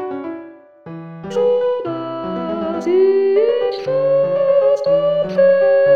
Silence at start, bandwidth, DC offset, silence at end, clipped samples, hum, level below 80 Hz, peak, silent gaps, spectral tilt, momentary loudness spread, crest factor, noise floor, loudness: 0 s; 6.8 kHz; 0.2%; 0 s; under 0.1%; none; -60 dBFS; -4 dBFS; none; -7 dB/octave; 16 LU; 12 dB; -38 dBFS; -16 LUFS